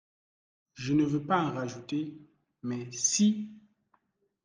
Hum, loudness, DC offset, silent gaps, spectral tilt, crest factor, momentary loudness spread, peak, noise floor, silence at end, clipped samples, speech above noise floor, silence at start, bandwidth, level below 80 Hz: none; -30 LUFS; under 0.1%; none; -4 dB/octave; 18 dB; 15 LU; -14 dBFS; -73 dBFS; 0.85 s; under 0.1%; 43 dB; 0.75 s; 10.5 kHz; -70 dBFS